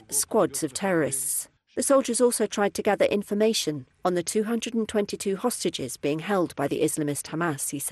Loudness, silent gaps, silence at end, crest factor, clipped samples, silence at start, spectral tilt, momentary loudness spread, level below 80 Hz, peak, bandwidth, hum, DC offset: -26 LUFS; none; 0 s; 16 dB; under 0.1%; 0.1 s; -3.5 dB/octave; 6 LU; -64 dBFS; -10 dBFS; 13 kHz; none; under 0.1%